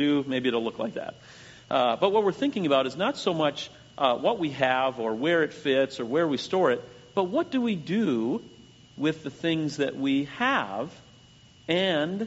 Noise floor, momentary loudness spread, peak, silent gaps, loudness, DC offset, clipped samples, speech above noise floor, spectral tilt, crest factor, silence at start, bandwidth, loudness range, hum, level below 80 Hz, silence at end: -54 dBFS; 9 LU; -6 dBFS; none; -26 LUFS; under 0.1%; under 0.1%; 28 dB; -3.5 dB/octave; 20 dB; 0 s; 8 kHz; 3 LU; none; -66 dBFS; 0 s